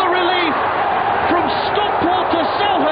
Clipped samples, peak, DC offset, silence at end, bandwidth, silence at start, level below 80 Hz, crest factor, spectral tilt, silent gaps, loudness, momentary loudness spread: under 0.1%; -4 dBFS; under 0.1%; 0 s; 5.2 kHz; 0 s; -46 dBFS; 12 dB; -1.5 dB/octave; none; -16 LUFS; 2 LU